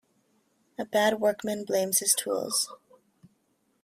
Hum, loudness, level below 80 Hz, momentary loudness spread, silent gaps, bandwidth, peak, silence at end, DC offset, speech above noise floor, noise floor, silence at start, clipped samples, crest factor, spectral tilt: none; -26 LUFS; -74 dBFS; 10 LU; none; 16 kHz; -10 dBFS; 1.1 s; under 0.1%; 45 dB; -72 dBFS; 0.8 s; under 0.1%; 20 dB; -2 dB/octave